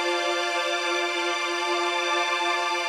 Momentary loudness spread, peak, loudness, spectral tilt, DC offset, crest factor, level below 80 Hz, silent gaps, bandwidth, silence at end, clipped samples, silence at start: 2 LU; -12 dBFS; -24 LUFS; 1.5 dB/octave; under 0.1%; 12 dB; -78 dBFS; none; 15 kHz; 0 s; under 0.1%; 0 s